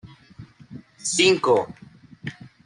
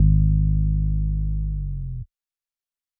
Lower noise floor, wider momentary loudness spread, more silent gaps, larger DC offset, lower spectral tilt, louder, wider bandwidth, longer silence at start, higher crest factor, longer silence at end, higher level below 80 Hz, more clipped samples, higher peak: second, -46 dBFS vs under -90 dBFS; first, 20 LU vs 15 LU; neither; neither; second, -3 dB/octave vs -23.5 dB/octave; first, -20 LUFS vs -24 LUFS; first, 11 kHz vs 0.5 kHz; about the same, 0.05 s vs 0 s; first, 20 dB vs 14 dB; second, 0.2 s vs 0.95 s; second, -62 dBFS vs -24 dBFS; neither; about the same, -6 dBFS vs -6 dBFS